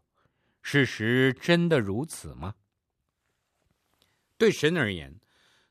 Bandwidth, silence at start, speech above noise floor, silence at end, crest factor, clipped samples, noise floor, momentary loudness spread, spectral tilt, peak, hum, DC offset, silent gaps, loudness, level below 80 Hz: 14 kHz; 0.65 s; 55 dB; 0.6 s; 20 dB; under 0.1%; -81 dBFS; 17 LU; -5.5 dB/octave; -8 dBFS; none; under 0.1%; none; -25 LUFS; -58 dBFS